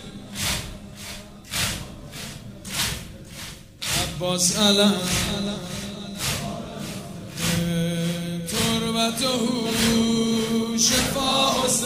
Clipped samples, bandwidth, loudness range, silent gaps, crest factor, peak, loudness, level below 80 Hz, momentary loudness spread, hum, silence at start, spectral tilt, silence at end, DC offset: under 0.1%; 16 kHz; 8 LU; none; 20 dB; -4 dBFS; -23 LUFS; -44 dBFS; 18 LU; none; 0 s; -3 dB/octave; 0 s; under 0.1%